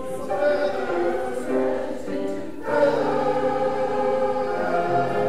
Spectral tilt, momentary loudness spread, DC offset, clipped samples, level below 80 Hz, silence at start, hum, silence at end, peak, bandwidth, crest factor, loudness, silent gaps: -6 dB/octave; 7 LU; 2%; under 0.1%; -56 dBFS; 0 s; none; 0 s; -8 dBFS; 13.5 kHz; 14 dB; -24 LUFS; none